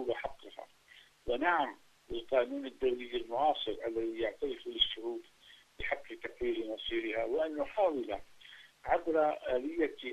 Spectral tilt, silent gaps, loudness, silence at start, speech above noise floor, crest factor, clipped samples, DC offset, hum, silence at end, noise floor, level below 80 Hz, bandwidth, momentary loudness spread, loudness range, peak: -4.5 dB/octave; none; -35 LUFS; 0 s; 27 dB; 20 dB; under 0.1%; under 0.1%; none; 0 s; -61 dBFS; -58 dBFS; 13 kHz; 15 LU; 2 LU; -16 dBFS